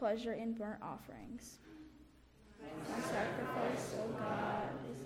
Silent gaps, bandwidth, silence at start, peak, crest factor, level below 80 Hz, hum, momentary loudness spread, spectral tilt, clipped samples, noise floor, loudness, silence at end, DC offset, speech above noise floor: none; 16.5 kHz; 0 s; -26 dBFS; 16 dB; -66 dBFS; none; 17 LU; -5.5 dB/octave; under 0.1%; -63 dBFS; -41 LUFS; 0 s; under 0.1%; 22 dB